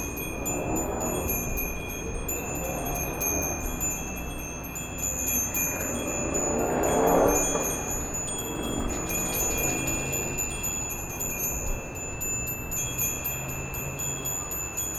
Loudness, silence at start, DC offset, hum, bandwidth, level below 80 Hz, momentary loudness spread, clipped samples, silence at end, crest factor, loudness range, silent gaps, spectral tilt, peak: -28 LUFS; 0 s; under 0.1%; none; over 20 kHz; -38 dBFS; 8 LU; under 0.1%; 0 s; 20 dB; 4 LU; none; -3.5 dB/octave; -8 dBFS